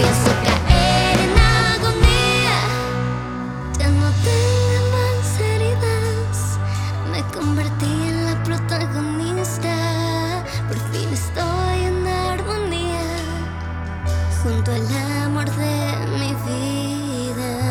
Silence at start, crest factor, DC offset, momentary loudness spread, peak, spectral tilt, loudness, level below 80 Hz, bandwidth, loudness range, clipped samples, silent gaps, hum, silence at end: 0 s; 18 dB; under 0.1%; 9 LU; -2 dBFS; -5 dB/octave; -20 LUFS; -28 dBFS; 16.5 kHz; 6 LU; under 0.1%; none; none; 0 s